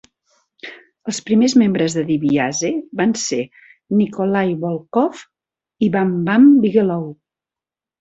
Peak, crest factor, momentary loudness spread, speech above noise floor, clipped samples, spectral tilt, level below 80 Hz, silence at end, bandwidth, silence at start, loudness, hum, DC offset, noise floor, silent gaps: -2 dBFS; 16 dB; 18 LU; 73 dB; under 0.1%; -5.5 dB/octave; -60 dBFS; 0.85 s; 8.2 kHz; 0.65 s; -17 LUFS; none; under 0.1%; -89 dBFS; none